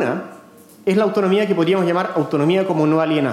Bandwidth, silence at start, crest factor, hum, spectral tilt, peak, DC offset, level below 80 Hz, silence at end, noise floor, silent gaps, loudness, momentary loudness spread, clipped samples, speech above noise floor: 14 kHz; 0 s; 12 dB; none; -7 dB/octave; -6 dBFS; under 0.1%; -76 dBFS; 0 s; -44 dBFS; none; -18 LUFS; 7 LU; under 0.1%; 27 dB